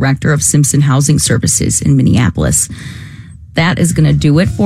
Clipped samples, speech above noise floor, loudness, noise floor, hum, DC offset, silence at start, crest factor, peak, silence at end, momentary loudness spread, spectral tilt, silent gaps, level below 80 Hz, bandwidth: under 0.1%; 21 dB; -11 LUFS; -31 dBFS; none; under 0.1%; 0 s; 10 dB; 0 dBFS; 0 s; 10 LU; -5 dB/octave; none; -32 dBFS; 15 kHz